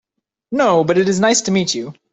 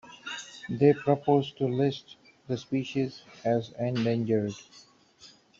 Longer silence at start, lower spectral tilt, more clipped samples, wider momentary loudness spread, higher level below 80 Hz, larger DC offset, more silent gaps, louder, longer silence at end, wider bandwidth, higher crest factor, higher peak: first, 0.5 s vs 0.05 s; second, -4 dB/octave vs -7 dB/octave; neither; second, 9 LU vs 14 LU; first, -56 dBFS vs -68 dBFS; neither; neither; first, -16 LUFS vs -29 LUFS; second, 0.2 s vs 0.35 s; about the same, 8.4 kHz vs 7.8 kHz; second, 14 dB vs 20 dB; first, -2 dBFS vs -8 dBFS